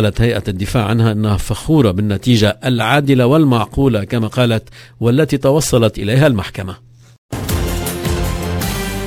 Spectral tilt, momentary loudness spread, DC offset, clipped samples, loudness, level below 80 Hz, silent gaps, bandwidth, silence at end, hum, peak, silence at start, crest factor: -6 dB/octave; 8 LU; under 0.1%; under 0.1%; -15 LUFS; -28 dBFS; 7.18-7.29 s; 16 kHz; 0 s; none; 0 dBFS; 0 s; 14 dB